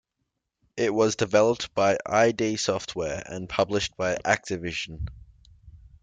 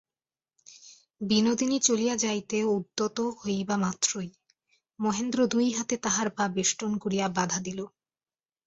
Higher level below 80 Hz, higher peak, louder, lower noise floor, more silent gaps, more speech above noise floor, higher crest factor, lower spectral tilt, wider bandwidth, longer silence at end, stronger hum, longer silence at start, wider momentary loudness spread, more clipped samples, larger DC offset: first, -50 dBFS vs -66 dBFS; about the same, -8 dBFS vs -10 dBFS; about the same, -25 LUFS vs -27 LUFS; second, -80 dBFS vs under -90 dBFS; neither; second, 55 dB vs over 62 dB; about the same, 18 dB vs 20 dB; about the same, -4 dB/octave vs -3.5 dB/octave; first, 9.4 kHz vs 8.4 kHz; second, 0.25 s vs 0.8 s; neither; about the same, 0.75 s vs 0.7 s; first, 11 LU vs 8 LU; neither; neither